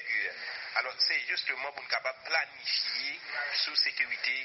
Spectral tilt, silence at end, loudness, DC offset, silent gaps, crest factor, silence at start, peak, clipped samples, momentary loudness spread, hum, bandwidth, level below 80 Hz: 5 dB/octave; 0 s; -30 LUFS; under 0.1%; none; 20 dB; 0 s; -12 dBFS; under 0.1%; 7 LU; none; 6.2 kHz; -88 dBFS